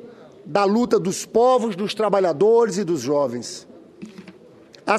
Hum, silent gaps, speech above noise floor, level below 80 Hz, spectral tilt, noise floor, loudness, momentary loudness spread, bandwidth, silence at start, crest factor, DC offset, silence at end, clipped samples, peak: none; none; 28 dB; -64 dBFS; -5 dB/octave; -47 dBFS; -20 LUFS; 18 LU; 13.5 kHz; 0 s; 18 dB; under 0.1%; 0 s; under 0.1%; -2 dBFS